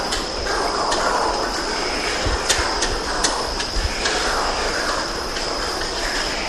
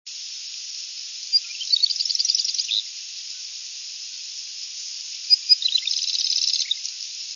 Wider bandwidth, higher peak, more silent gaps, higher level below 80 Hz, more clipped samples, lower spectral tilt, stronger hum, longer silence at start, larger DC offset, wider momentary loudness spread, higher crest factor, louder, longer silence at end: first, 16 kHz vs 7.4 kHz; about the same, -2 dBFS vs -4 dBFS; neither; first, -32 dBFS vs under -90 dBFS; neither; first, -2 dB/octave vs 12.5 dB/octave; neither; about the same, 0 s vs 0.05 s; first, 0.4% vs under 0.1%; second, 4 LU vs 14 LU; about the same, 20 dB vs 20 dB; about the same, -21 LUFS vs -22 LUFS; about the same, 0 s vs 0 s